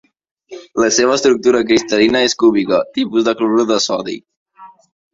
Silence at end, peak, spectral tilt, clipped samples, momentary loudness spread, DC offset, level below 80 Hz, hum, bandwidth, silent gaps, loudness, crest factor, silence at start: 0.45 s; 0 dBFS; -3 dB/octave; under 0.1%; 7 LU; under 0.1%; -54 dBFS; none; 7.8 kHz; 4.36-4.46 s; -14 LUFS; 16 dB; 0.5 s